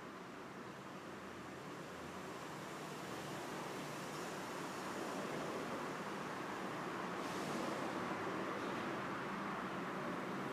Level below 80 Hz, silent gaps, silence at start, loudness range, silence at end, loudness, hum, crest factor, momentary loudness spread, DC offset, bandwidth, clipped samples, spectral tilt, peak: -76 dBFS; none; 0 s; 5 LU; 0 s; -45 LUFS; none; 14 dB; 8 LU; under 0.1%; 15.5 kHz; under 0.1%; -4.5 dB/octave; -30 dBFS